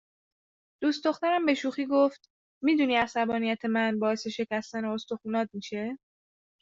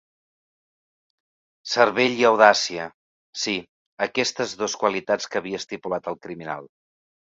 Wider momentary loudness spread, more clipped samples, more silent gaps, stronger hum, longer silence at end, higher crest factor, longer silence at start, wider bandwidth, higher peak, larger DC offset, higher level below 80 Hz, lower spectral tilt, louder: second, 9 LU vs 18 LU; neither; second, 2.30-2.61 s vs 2.94-3.33 s, 3.69-3.97 s; neither; about the same, 0.65 s vs 0.7 s; about the same, 20 dB vs 24 dB; second, 0.8 s vs 1.65 s; about the same, 7.8 kHz vs 7.8 kHz; second, -10 dBFS vs 0 dBFS; neither; about the same, -70 dBFS vs -68 dBFS; first, -5 dB/octave vs -2.5 dB/octave; second, -28 LUFS vs -22 LUFS